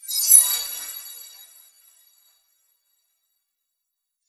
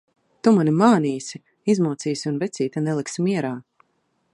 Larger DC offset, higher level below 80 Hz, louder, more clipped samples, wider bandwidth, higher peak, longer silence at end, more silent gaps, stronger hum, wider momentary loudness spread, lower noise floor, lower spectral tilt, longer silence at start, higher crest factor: neither; about the same, -74 dBFS vs -70 dBFS; first, -15 LUFS vs -22 LUFS; neither; first, 15 kHz vs 11 kHz; about the same, 0 dBFS vs -2 dBFS; first, 3 s vs 0.75 s; neither; neither; first, 25 LU vs 13 LU; first, -81 dBFS vs -69 dBFS; second, 6 dB/octave vs -6.5 dB/octave; second, 0.05 s vs 0.45 s; first, 26 dB vs 20 dB